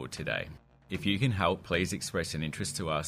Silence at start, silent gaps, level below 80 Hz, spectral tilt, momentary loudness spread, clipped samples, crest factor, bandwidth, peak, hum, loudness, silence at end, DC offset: 0 s; none; -54 dBFS; -4.5 dB/octave; 7 LU; under 0.1%; 20 dB; 15.5 kHz; -12 dBFS; none; -32 LUFS; 0 s; under 0.1%